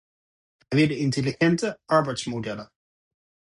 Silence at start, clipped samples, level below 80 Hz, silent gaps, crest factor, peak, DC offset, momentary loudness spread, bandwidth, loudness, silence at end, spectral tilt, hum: 0.7 s; under 0.1%; -60 dBFS; none; 20 dB; -6 dBFS; under 0.1%; 9 LU; 11.5 kHz; -24 LUFS; 0.75 s; -6 dB/octave; none